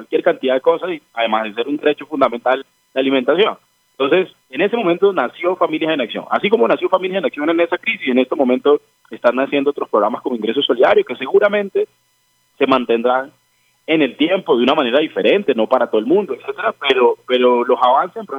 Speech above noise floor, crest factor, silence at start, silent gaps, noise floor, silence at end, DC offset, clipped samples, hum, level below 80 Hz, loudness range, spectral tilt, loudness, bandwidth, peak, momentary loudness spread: 45 dB; 16 dB; 0 s; none; -61 dBFS; 0 s; under 0.1%; under 0.1%; none; -66 dBFS; 2 LU; -6.5 dB/octave; -16 LUFS; 6.8 kHz; 0 dBFS; 7 LU